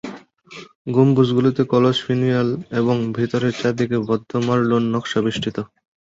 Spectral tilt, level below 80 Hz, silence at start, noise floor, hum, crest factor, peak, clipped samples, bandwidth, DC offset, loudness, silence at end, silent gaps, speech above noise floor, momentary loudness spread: -7 dB/octave; -56 dBFS; 0.05 s; -41 dBFS; none; 18 dB; -2 dBFS; under 0.1%; 7.8 kHz; under 0.1%; -19 LUFS; 0.45 s; 0.75-0.85 s; 23 dB; 13 LU